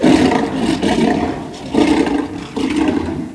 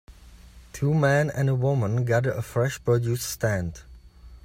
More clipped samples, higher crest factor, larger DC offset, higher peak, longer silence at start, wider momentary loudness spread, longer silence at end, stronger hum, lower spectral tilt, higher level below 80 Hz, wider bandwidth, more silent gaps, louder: neither; about the same, 16 dB vs 16 dB; neither; first, 0 dBFS vs -10 dBFS; about the same, 0 s vs 0.1 s; about the same, 9 LU vs 8 LU; about the same, 0 s vs 0.1 s; neither; about the same, -5.5 dB/octave vs -6.5 dB/octave; first, -38 dBFS vs -48 dBFS; second, 11 kHz vs 16 kHz; neither; first, -16 LUFS vs -25 LUFS